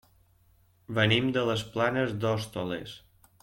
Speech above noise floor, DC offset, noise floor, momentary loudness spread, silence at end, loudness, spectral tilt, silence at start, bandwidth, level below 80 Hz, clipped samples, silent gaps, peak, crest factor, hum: 36 dB; under 0.1%; -64 dBFS; 13 LU; 0.45 s; -28 LUFS; -5.5 dB/octave; 0.9 s; 16.5 kHz; -60 dBFS; under 0.1%; none; -10 dBFS; 20 dB; none